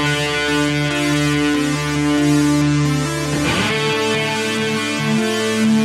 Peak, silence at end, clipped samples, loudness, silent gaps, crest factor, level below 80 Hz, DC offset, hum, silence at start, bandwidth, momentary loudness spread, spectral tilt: -4 dBFS; 0 s; under 0.1%; -17 LUFS; none; 14 dB; -40 dBFS; under 0.1%; none; 0 s; 15.5 kHz; 3 LU; -4.5 dB/octave